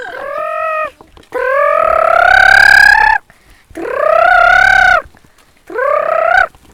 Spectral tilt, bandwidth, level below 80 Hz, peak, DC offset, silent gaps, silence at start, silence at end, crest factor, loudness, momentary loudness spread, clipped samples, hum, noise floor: -2 dB/octave; over 20 kHz; -36 dBFS; 0 dBFS; under 0.1%; none; 0 s; 0.25 s; 10 dB; -8 LUFS; 17 LU; 0.9%; none; -46 dBFS